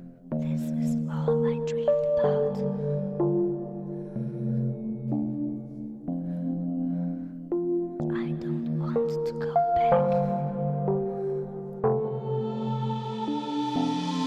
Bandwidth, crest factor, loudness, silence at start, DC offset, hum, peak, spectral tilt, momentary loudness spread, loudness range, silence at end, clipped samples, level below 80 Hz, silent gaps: 9 kHz; 18 dB; -28 LUFS; 0 s; under 0.1%; none; -8 dBFS; -8.5 dB/octave; 9 LU; 5 LU; 0 s; under 0.1%; -60 dBFS; none